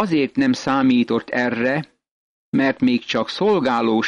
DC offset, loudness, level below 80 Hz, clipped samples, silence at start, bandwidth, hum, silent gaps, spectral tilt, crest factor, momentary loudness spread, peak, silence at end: under 0.1%; -19 LUFS; -58 dBFS; under 0.1%; 0 s; 7.8 kHz; none; 2.11-2.52 s; -6 dB/octave; 12 dB; 6 LU; -8 dBFS; 0 s